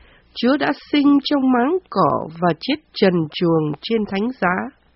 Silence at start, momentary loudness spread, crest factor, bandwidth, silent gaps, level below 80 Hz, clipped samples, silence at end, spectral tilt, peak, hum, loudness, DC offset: 0.35 s; 7 LU; 16 dB; 5.8 kHz; none; -56 dBFS; under 0.1%; 0.25 s; -4.5 dB/octave; -2 dBFS; none; -19 LUFS; under 0.1%